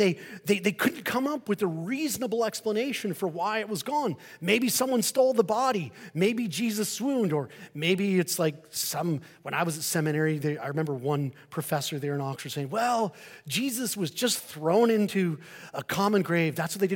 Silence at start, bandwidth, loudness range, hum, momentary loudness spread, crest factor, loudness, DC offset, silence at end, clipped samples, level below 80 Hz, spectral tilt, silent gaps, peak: 0 s; 17 kHz; 3 LU; none; 9 LU; 20 dB; -28 LUFS; under 0.1%; 0 s; under 0.1%; -74 dBFS; -4.5 dB/octave; none; -8 dBFS